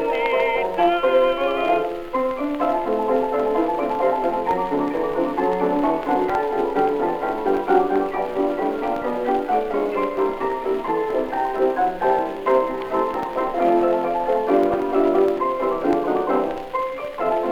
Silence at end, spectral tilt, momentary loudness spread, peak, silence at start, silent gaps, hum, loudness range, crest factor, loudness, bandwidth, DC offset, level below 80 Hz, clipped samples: 0 s; -6.5 dB/octave; 5 LU; -4 dBFS; 0 s; none; none; 2 LU; 16 dB; -21 LUFS; 17.5 kHz; under 0.1%; -46 dBFS; under 0.1%